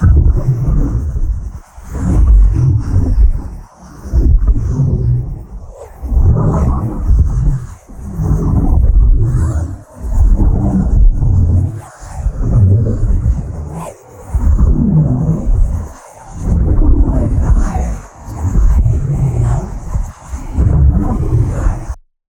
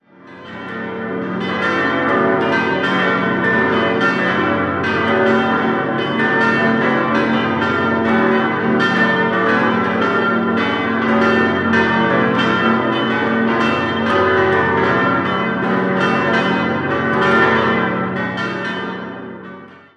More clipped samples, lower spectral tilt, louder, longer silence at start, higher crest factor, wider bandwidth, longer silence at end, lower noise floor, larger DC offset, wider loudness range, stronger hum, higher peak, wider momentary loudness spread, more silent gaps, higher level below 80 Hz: neither; first, -9.5 dB/octave vs -6.5 dB/octave; about the same, -14 LUFS vs -16 LUFS; second, 0 s vs 0.25 s; about the same, 12 dB vs 14 dB; first, 9.6 kHz vs 8.6 kHz; first, 0.35 s vs 0.2 s; second, -32 dBFS vs -38 dBFS; neither; about the same, 2 LU vs 1 LU; neither; about the same, 0 dBFS vs -2 dBFS; first, 17 LU vs 8 LU; neither; first, -14 dBFS vs -46 dBFS